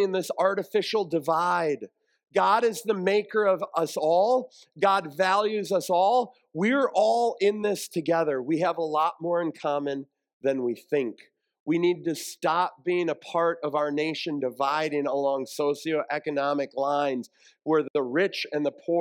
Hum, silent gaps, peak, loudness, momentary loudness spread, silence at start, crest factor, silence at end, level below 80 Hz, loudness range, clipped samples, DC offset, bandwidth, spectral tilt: none; 10.33-10.41 s, 11.60-11.66 s, 17.90-17.94 s; -10 dBFS; -26 LUFS; 7 LU; 0 s; 16 dB; 0 s; -84 dBFS; 4 LU; under 0.1%; under 0.1%; 17.5 kHz; -5 dB/octave